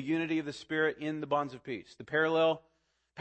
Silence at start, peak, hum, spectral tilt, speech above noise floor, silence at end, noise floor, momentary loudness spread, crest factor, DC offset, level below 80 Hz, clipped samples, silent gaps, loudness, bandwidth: 0 s; -16 dBFS; none; -6 dB/octave; 25 dB; 0 s; -57 dBFS; 13 LU; 16 dB; under 0.1%; -74 dBFS; under 0.1%; none; -32 LUFS; 8.6 kHz